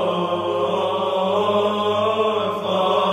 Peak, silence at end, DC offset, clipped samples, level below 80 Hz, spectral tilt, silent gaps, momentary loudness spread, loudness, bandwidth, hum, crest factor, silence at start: -8 dBFS; 0 s; under 0.1%; under 0.1%; -64 dBFS; -5.5 dB/octave; none; 3 LU; -20 LUFS; 14.5 kHz; none; 12 dB; 0 s